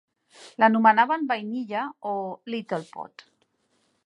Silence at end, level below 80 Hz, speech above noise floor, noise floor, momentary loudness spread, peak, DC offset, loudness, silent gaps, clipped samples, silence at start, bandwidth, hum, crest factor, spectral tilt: 1 s; -84 dBFS; 46 dB; -70 dBFS; 22 LU; -4 dBFS; under 0.1%; -24 LUFS; none; under 0.1%; 0.4 s; 10.5 kHz; none; 22 dB; -6 dB/octave